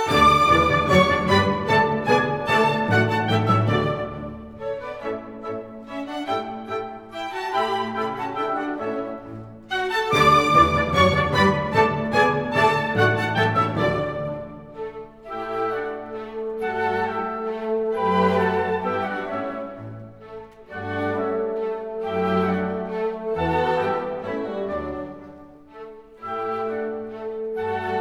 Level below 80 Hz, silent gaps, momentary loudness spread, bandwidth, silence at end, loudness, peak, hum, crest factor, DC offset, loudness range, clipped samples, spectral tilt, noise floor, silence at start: -46 dBFS; none; 17 LU; 17.5 kHz; 0 s; -22 LUFS; -4 dBFS; none; 20 dB; 0.1%; 10 LU; under 0.1%; -6 dB/octave; -44 dBFS; 0 s